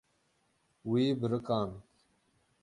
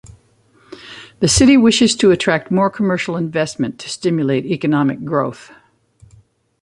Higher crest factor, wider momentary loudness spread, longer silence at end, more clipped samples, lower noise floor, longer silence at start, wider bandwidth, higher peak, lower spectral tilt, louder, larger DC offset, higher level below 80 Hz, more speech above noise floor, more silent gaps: about the same, 18 dB vs 16 dB; about the same, 14 LU vs 13 LU; second, 0.8 s vs 1.15 s; neither; first, -74 dBFS vs -54 dBFS; first, 0.85 s vs 0.05 s; about the same, 11 kHz vs 11.5 kHz; second, -18 dBFS vs 0 dBFS; first, -8 dB/octave vs -4.5 dB/octave; second, -32 LUFS vs -15 LUFS; neither; second, -66 dBFS vs -40 dBFS; first, 43 dB vs 39 dB; neither